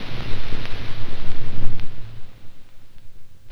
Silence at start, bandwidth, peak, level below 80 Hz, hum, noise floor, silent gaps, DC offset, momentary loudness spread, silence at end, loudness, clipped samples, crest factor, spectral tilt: 0 s; 5.2 kHz; 0 dBFS; -28 dBFS; none; -32 dBFS; none; under 0.1%; 21 LU; 0 s; -34 LUFS; under 0.1%; 14 dB; -6 dB/octave